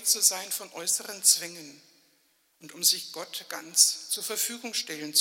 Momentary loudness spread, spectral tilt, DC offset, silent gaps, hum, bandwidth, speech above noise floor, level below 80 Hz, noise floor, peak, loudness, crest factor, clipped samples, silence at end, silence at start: 15 LU; 1.5 dB/octave; under 0.1%; none; none; 16.5 kHz; 40 dB; under -90 dBFS; -68 dBFS; -4 dBFS; -25 LUFS; 24 dB; under 0.1%; 0 s; 0 s